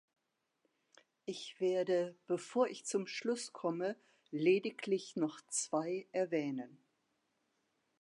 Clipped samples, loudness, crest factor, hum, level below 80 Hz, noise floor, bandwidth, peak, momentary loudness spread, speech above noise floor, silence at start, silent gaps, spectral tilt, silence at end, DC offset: under 0.1%; -37 LUFS; 20 dB; none; under -90 dBFS; -82 dBFS; 11 kHz; -20 dBFS; 12 LU; 45 dB; 1.25 s; none; -4 dB/octave; 1.25 s; under 0.1%